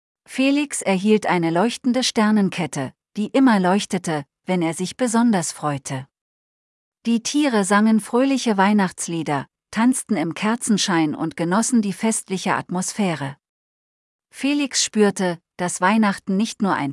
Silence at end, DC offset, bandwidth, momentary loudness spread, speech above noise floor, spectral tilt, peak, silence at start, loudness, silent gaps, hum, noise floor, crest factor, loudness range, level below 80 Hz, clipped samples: 0 s; under 0.1%; 12 kHz; 9 LU; over 70 dB; -4.5 dB/octave; -4 dBFS; 0.3 s; -20 LUFS; 6.21-6.92 s, 13.49-14.19 s; none; under -90 dBFS; 16 dB; 4 LU; -68 dBFS; under 0.1%